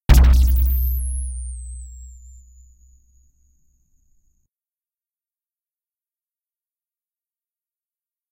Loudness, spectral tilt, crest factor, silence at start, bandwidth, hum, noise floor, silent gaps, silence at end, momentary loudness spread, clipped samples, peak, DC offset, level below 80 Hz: -19 LUFS; -5.5 dB/octave; 22 dB; 0.1 s; 16 kHz; none; under -90 dBFS; none; 6.2 s; 26 LU; under 0.1%; 0 dBFS; under 0.1%; -22 dBFS